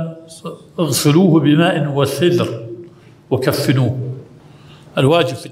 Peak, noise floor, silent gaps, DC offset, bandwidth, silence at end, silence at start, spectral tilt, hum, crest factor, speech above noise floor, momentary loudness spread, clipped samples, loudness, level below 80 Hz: 0 dBFS; -41 dBFS; none; under 0.1%; 16 kHz; 0 s; 0 s; -6 dB/octave; none; 16 dB; 27 dB; 20 LU; under 0.1%; -15 LUFS; -54 dBFS